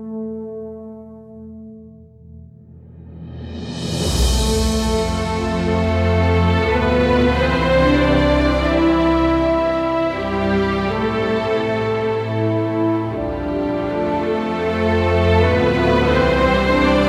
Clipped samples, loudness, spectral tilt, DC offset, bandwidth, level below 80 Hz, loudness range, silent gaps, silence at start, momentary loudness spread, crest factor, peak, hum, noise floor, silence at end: under 0.1%; -18 LUFS; -6 dB/octave; under 0.1%; 15 kHz; -28 dBFS; 10 LU; none; 0 s; 15 LU; 14 dB; -4 dBFS; none; -41 dBFS; 0 s